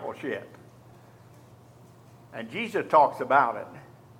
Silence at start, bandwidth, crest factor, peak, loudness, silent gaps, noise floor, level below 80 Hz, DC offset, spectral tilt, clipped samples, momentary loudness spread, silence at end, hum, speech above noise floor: 0 s; 16 kHz; 24 dB; -6 dBFS; -25 LUFS; none; -52 dBFS; -72 dBFS; under 0.1%; -5.5 dB/octave; under 0.1%; 19 LU; 0.4 s; none; 27 dB